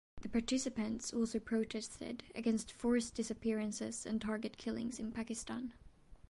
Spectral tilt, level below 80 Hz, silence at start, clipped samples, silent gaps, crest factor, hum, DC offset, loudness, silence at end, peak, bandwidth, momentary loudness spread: -4 dB/octave; -62 dBFS; 0.15 s; under 0.1%; none; 16 dB; none; under 0.1%; -39 LUFS; 0.15 s; -22 dBFS; 11.5 kHz; 8 LU